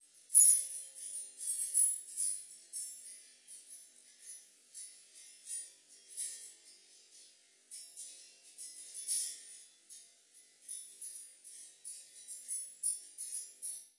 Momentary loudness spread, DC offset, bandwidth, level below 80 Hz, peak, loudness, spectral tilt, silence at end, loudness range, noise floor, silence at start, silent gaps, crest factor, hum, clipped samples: 24 LU; under 0.1%; 11.5 kHz; under -90 dBFS; -10 dBFS; -32 LUFS; 5 dB/octave; 0.1 s; 13 LU; -64 dBFS; 0.3 s; none; 28 dB; none; under 0.1%